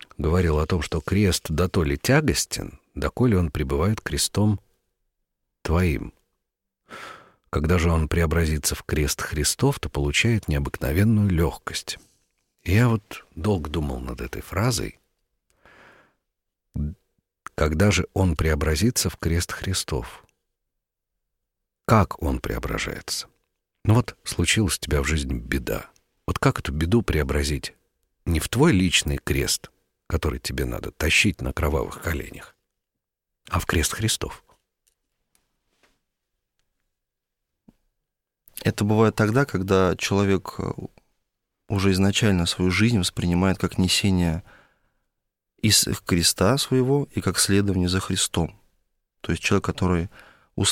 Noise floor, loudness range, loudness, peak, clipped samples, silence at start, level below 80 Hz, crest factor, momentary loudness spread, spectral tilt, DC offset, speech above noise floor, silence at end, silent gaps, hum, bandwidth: -84 dBFS; 7 LU; -23 LUFS; -4 dBFS; under 0.1%; 0.2 s; -36 dBFS; 20 dB; 12 LU; -4.5 dB/octave; under 0.1%; 62 dB; 0 s; none; none; 16.5 kHz